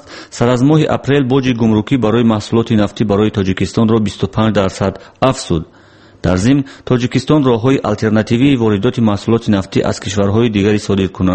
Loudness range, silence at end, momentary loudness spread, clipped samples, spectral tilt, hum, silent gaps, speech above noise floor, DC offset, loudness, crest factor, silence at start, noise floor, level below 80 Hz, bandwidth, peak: 3 LU; 0 s; 5 LU; under 0.1%; -6.5 dB/octave; none; none; 30 dB; under 0.1%; -14 LUFS; 14 dB; 0.1 s; -43 dBFS; -38 dBFS; 8.8 kHz; 0 dBFS